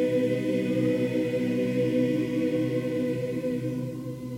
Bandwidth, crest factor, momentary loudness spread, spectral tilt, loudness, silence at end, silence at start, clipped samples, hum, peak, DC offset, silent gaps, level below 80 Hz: 16 kHz; 12 dB; 5 LU; -7.5 dB/octave; -27 LUFS; 0 s; 0 s; under 0.1%; none; -14 dBFS; under 0.1%; none; -60 dBFS